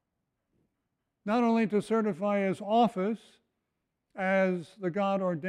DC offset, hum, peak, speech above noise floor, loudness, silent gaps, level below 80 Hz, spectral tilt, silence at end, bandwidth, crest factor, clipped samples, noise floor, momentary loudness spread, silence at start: under 0.1%; none; -14 dBFS; 55 dB; -29 LUFS; none; -76 dBFS; -7 dB/octave; 0 s; 11 kHz; 16 dB; under 0.1%; -83 dBFS; 8 LU; 1.25 s